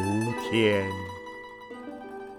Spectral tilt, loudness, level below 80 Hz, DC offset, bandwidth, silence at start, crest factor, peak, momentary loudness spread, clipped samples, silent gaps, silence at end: -5.5 dB/octave; -27 LUFS; -64 dBFS; under 0.1%; 17.5 kHz; 0 s; 20 dB; -10 dBFS; 18 LU; under 0.1%; none; 0 s